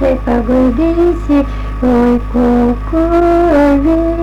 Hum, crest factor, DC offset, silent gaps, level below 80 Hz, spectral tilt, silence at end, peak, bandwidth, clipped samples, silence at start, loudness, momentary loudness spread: none; 6 dB; under 0.1%; none; -20 dBFS; -8.5 dB/octave; 0 s; -4 dBFS; 8.8 kHz; under 0.1%; 0 s; -12 LUFS; 4 LU